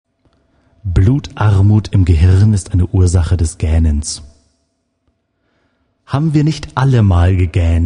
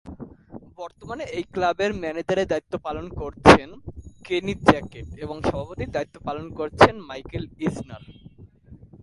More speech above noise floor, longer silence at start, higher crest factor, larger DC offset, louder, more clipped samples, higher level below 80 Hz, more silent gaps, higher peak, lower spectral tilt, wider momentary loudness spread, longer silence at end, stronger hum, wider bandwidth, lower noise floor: first, 54 dB vs 25 dB; first, 0.85 s vs 0.05 s; second, 14 dB vs 24 dB; neither; first, -13 LUFS vs -22 LUFS; neither; first, -22 dBFS vs -42 dBFS; neither; about the same, 0 dBFS vs 0 dBFS; first, -7 dB/octave vs -5.5 dB/octave; second, 8 LU vs 22 LU; second, 0 s vs 0.25 s; neither; about the same, 10.5 kHz vs 11.5 kHz; first, -65 dBFS vs -48 dBFS